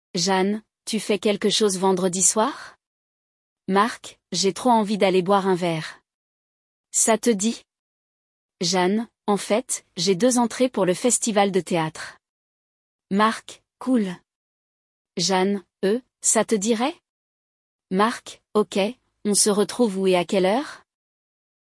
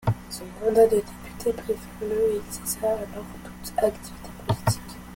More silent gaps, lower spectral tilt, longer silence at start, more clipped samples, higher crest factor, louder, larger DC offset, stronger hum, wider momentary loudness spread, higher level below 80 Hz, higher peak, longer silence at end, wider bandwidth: first, 2.87-3.56 s, 6.14-6.84 s, 7.79-8.49 s, 12.29-12.99 s, 14.35-15.05 s, 17.09-17.79 s vs none; second, -3.5 dB/octave vs -5.5 dB/octave; first, 0.15 s vs 0 s; neither; about the same, 18 dB vs 20 dB; first, -22 LUFS vs -26 LUFS; neither; neither; second, 11 LU vs 18 LU; second, -70 dBFS vs -46 dBFS; first, -4 dBFS vs -8 dBFS; first, 0.85 s vs 0 s; second, 12 kHz vs 17 kHz